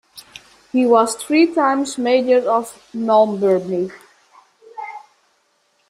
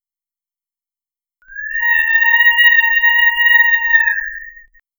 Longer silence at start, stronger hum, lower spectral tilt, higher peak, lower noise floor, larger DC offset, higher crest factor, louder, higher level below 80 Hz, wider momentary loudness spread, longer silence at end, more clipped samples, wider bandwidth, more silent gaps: second, 0.15 s vs 1.5 s; neither; first, -4.5 dB/octave vs 1 dB/octave; about the same, -2 dBFS vs 0 dBFS; second, -63 dBFS vs under -90 dBFS; neither; about the same, 18 dB vs 14 dB; second, -17 LUFS vs -10 LUFS; second, -66 dBFS vs -50 dBFS; first, 19 LU vs 14 LU; first, 0.9 s vs 0.5 s; neither; second, 15 kHz vs over 20 kHz; neither